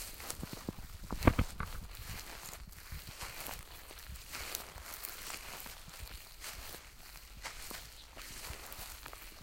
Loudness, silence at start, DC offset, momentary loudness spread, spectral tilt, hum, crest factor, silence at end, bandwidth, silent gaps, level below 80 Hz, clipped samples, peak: -43 LUFS; 0 s; under 0.1%; 10 LU; -4 dB/octave; none; 34 dB; 0 s; 17 kHz; none; -48 dBFS; under 0.1%; -10 dBFS